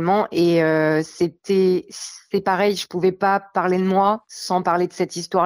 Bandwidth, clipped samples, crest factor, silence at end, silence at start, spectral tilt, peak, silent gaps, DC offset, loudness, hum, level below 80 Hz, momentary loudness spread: over 20 kHz; under 0.1%; 14 dB; 0 s; 0 s; -5.5 dB/octave; -6 dBFS; none; under 0.1%; -20 LUFS; none; -62 dBFS; 7 LU